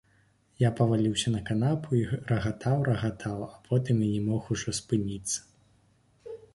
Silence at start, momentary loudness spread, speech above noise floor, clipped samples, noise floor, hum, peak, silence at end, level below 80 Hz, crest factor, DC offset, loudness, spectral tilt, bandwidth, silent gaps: 0.6 s; 8 LU; 38 dB; under 0.1%; -65 dBFS; none; -10 dBFS; 0.15 s; -54 dBFS; 18 dB; under 0.1%; -29 LUFS; -6 dB/octave; 11.5 kHz; none